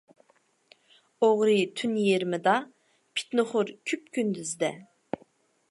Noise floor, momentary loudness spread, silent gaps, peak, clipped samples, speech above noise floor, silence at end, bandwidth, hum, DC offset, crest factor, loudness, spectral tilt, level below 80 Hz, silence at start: -67 dBFS; 16 LU; none; -10 dBFS; under 0.1%; 41 dB; 0.9 s; 11.5 kHz; none; under 0.1%; 20 dB; -27 LUFS; -4.5 dB/octave; -78 dBFS; 1.2 s